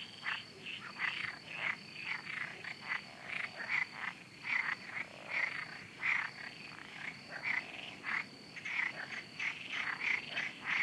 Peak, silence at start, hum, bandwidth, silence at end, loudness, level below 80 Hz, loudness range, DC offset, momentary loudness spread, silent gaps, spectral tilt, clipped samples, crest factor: -22 dBFS; 0 s; none; 13.5 kHz; 0 s; -39 LUFS; -80 dBFS; 3 LU; under 0.1%; 10 LU; none; -2 dB/octave; under 0.1%; 20 dB